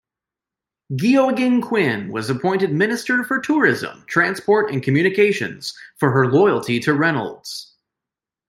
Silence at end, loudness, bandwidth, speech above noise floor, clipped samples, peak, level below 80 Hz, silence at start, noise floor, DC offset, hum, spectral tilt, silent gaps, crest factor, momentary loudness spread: 0.85 s; -18 LUFS; 16 kHz; 69 dB; under 0.1%; -2 dBFS; -64 dBFS; 0.9 s; -88 dBFS; under 0.1%; none; -6 dB/octave; none; 18 dB; 11 LU